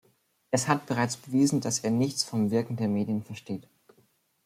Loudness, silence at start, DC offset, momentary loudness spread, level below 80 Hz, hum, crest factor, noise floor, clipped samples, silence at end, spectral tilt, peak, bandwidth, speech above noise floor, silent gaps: -28 LUFS; 0.5 s; under 0.1%; 12 LU; -68 dBFS; none; 22 dB; -67 dBFS; under 0.1%; 0.85 s; -5 dB/octave; -8 dBFS; 16 kHz; 40 dB; none